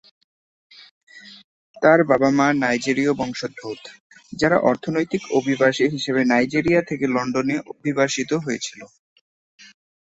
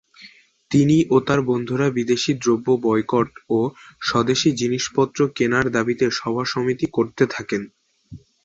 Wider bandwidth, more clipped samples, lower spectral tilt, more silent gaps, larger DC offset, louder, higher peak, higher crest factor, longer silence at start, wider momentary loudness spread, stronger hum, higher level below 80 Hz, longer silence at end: about the same, 8.2 kHz vs 8 kHz; neither; about the same, -5 dB/octave vs -5.5 dB/octave; first, 1.44-1.74 s, 4.00-4.10 s vs none; neither; about the same, -20 LUFS vs -20 LUFS; about the same, -2 dBFS vs -4 dBFS; about the same, 20 dB vs 18 dB; first, 1.15 s vs 0.2 s; first, 12 LU vs 6 LU; neither; about the same, -58 dBFS vs -54 dBFS; first, 1.2 s vs 0.25 s